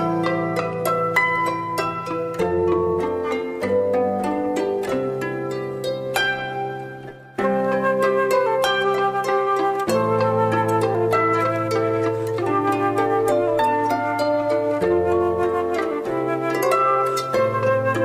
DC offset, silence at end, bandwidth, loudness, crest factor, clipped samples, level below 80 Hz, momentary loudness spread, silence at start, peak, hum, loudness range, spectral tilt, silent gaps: under 0.1%; 0 s; 15.5 kHz; -21 LUFS; 14 dB; under 0.1%; -54 dBFS; 6 LU; 0 s; -6 dBFS; none; 4 LU; -5.5 dB/octave; none